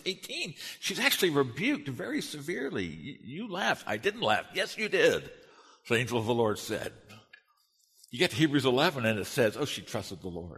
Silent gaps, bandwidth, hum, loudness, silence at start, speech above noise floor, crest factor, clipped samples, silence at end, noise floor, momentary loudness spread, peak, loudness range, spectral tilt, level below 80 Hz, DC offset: none; 13.5 kHz; none; -30 LUFS; 0.05 s; 40 dB; 22 dB; under 0.1%; 0 s; -70 dBFS; 12 LU; -8 dBFS; 2 LU; -4 dB/octave; -66 dBFS; under 0.1%